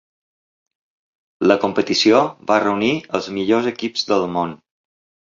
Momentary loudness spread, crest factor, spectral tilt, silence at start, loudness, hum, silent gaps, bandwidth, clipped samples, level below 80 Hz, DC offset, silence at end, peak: 9 LU; 18 dB; -4.5 dB/octave; 1.4 s; -18 LUFS; none; none; 7.6 kHz; under 0.1%; -60 dBFS; under 0.1%; 0.75 s; -2 dBFS